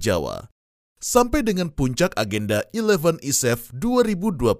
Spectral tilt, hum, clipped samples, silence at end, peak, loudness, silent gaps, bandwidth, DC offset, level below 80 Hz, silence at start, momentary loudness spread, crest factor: -4.5 dB/octave; none; under 0.1%; 0 s; -2 dBFS; -22 LUFS; 0.51-0.95 s; 16 kHz; under 0.1%; -40 dBFS; 0 s; 6 LU; 20 dB